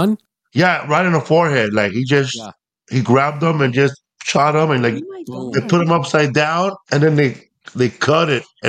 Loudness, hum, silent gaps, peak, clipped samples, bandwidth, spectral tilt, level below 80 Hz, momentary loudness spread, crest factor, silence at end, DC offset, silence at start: -16 LUFS; none; none; -2 dBFS; under 0.1%; 14 kHz; -6 dB/octave; -60 dBFS; 11 LU; 16 dB; 0 s; under 0.1%; 0 s